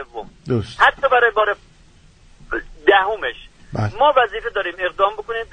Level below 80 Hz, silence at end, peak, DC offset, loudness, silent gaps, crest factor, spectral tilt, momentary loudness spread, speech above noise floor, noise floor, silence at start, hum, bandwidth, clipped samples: -44 dBFS; 0.1 s; 0 dBFS; under 0.1%; -18 LUFS; none; 20 dB; -6 dB/octave; 14 LU; 31 dB; -49 dBFS; 0 s; none; 9.4 kHz; under 0.1%